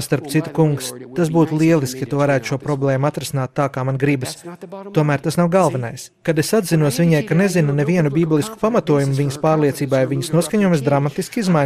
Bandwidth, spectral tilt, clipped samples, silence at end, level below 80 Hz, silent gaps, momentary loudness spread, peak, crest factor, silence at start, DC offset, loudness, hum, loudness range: 15.5 kHz; -6.5 dB/octave; under 0.1%; 0 s; -54 dBFS; none; 7 LU; -4 dBFS; 14 dB; 0 s; under 0.1%; -18 LUFS; none; 3 LU